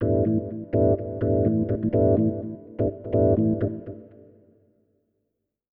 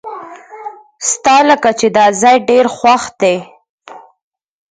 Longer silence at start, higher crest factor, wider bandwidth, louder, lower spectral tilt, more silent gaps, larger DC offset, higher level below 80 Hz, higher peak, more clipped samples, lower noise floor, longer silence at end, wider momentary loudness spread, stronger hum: about the same, 0 s vs 0.05 s; about the same, 16 dB vs 14 dB; second, 3.1 kHz vs 9.6 kHz; second, -24 LUFS vs -11 LUFS; first, -12.5 dB/octave vs -2.5 dB/octave; second, none vs 3.69-3.78 s; neither; first, -44 dBFS vs -56 dBFS; second, -8 dBFS vs 0 dBFS; neither; first, -79 dBFS vs -31 dBFS; first, 1.7 s vs 0.75 s; second, 13 LU vs 21 LU; neither